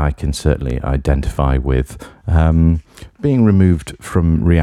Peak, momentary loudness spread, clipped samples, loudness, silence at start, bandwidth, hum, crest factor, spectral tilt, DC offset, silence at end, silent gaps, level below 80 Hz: 0 dBFS; 8 LU; under 0.1%; -16 LUFS; 0 s; 12.5 kHz; none; 14 dB; -8 dB/octave; under 0.1%; 0 s; none; -22 dBFS